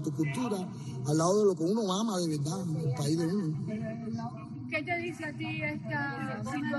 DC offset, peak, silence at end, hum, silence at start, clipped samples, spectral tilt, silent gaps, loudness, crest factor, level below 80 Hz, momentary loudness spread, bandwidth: under 0.1%; -16 dBFS; 0 s; none; 0 s; under 0.1%; -6 dB/octave; none; -32 LUFS; 16 dB; -68 dBFS; 10 LU; 12.5 kHz